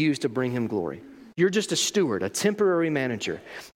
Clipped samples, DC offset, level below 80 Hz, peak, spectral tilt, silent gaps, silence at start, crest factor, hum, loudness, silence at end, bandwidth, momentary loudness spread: under 0.1%; under 0.1%; -68 dBFS; -10 dBFS; -4 dB/octave; none; 0 s; 16 dB; none; -25 LUFS; 0.05 s; 16.5 kHz; 11 LU